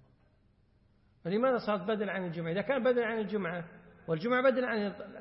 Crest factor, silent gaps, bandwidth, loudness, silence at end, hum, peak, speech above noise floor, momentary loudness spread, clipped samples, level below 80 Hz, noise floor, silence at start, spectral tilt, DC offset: 18 dB; none; 5.8 kHz; -32 LUFS; 0 s; none; -16 dBFS; 36 dB; 11 LU; under 0.1%; -70 dBFS; -67 dBFS; 1.25 s; -10 dB/octave; under 0.1%